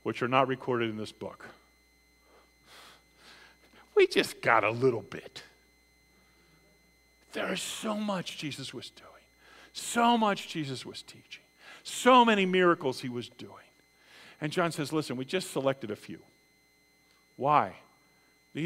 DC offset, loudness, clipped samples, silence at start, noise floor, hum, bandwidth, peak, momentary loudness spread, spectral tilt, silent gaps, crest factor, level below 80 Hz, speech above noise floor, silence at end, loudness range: under 0.1%; -29 LUFS; under 0.1%; 0.05 s; -66 dBFS; none; 16 kHz; -8 dBFS; 22 LU; -4.5 dB/octave; none; 24 dB; -72 dBFS; 37 dB; 0 s; 10 LU